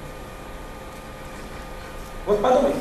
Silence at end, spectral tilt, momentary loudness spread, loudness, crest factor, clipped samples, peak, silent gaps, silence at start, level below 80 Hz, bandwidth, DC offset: 0 s; -5.5 dB/octave; 19 LU; -23 LUFS; 20 dB; under 0.1%; -6 dBFS; none; 0 s; -40 dBFS; 14 kHz; under 0.1%